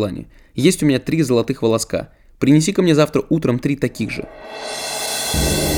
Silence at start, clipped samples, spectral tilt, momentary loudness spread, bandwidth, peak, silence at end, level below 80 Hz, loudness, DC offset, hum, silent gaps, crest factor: 0 s; under 0.1%; -5 dB/octave; 14 LU; 19.5 kHz; 0 dBFS; 0 s; -36 dBFS; -18 LUFS; under 0.1%; none; none; 18 dB